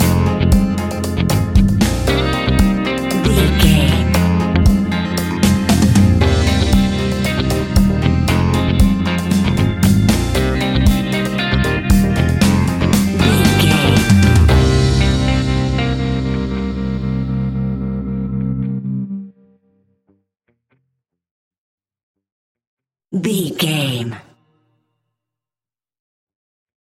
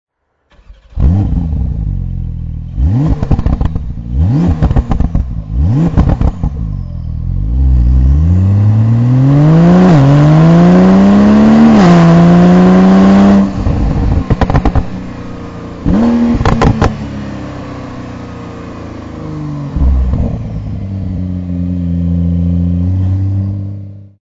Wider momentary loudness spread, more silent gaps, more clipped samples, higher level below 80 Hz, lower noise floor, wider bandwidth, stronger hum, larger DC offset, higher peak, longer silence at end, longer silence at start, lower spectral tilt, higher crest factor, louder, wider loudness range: second, 9 LU vs 19 LU; first, 21.31-21.51 s, 21.58-21.78 s, 22.03-22.15 s, 22.32-22.55 s, 22.67-22.77 s vs none; second, under 0.1% vs 0.2%; about the same, -22 dBFS vs -18 dBFS; first, under -90 dBFS vs -53 dBFS; first, 17 kHz vs 7.6 kHz; neither; neither; about the same, 0 dBFS vs 0 dBFS; first, 2.7 s vs 0.25 s; second, 0 s vs 0.7 s; second, -6 dB/octave vs -9 dB/octave; first, 16 dB vs 10 dB; second, -15 LUFS vs -10 LUFS; about the same, 12 LU vs 12 LU